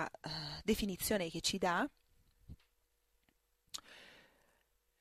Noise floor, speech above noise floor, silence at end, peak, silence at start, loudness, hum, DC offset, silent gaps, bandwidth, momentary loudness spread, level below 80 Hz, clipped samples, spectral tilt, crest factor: -78 dBFS; 42 dB; 0.8 s; -20 dBFS; 0 s; -38 LUFS; none; under 0.1%; none; 15 kHz; 14 LU; -60 dBFS; under 0.1%; -3.5 dB/octave; 20 dB